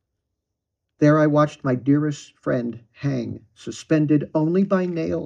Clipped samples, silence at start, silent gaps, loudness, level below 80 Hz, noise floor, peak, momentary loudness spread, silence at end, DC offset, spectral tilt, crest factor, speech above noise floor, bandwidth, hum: under 0.1%; 1 s; none; -21 LUFS; -62 dBFS; -81 dBFS; -6 dBFS; 15 LU; 0 s; under 0.1%; -8 dB/octave; 16 dB; 60 dB; 8.8 kHz; none